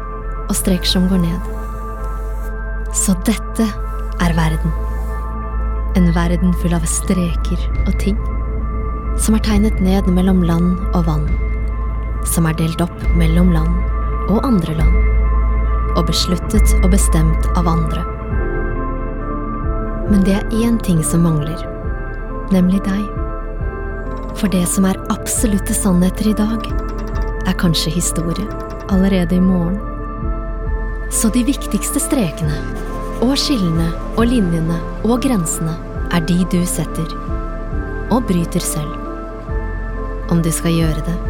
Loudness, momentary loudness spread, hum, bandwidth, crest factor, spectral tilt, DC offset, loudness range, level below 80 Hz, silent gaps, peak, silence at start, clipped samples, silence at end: -18 LUFS; 11 LU; none; 17.5 kHz; 16 dB; -5.5 dB/octave; under 0.1%; 3 LU; -20 dBFS; none; 0 dBFS; 0 s; under 0.1%; 0 s